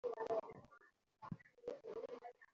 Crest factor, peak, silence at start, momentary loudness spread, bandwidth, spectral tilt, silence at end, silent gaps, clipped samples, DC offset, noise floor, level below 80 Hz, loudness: 20 dB; -30 dBFS; 0.05 s; 18 LU; 7.4 kHz; -5.5 dB/octave; 0.1 s; none; under 0.1%; under 0.1%; -70 dBFS; -80 dBFS; -49 LUFS